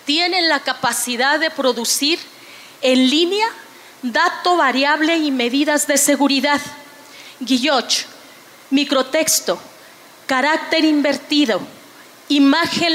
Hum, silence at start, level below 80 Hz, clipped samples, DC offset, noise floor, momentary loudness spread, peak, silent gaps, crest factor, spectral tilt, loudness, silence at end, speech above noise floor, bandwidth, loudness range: none; 0.05 s; -70 dBFS; under 0.1%; under 0.1%; -43 dBFS; 9 LU; -4 dBFS; none; 14 dB; -1.5 dB/octave; -16 LUFS; 0 s; 26 dB; 16.5 kHz; 3 LU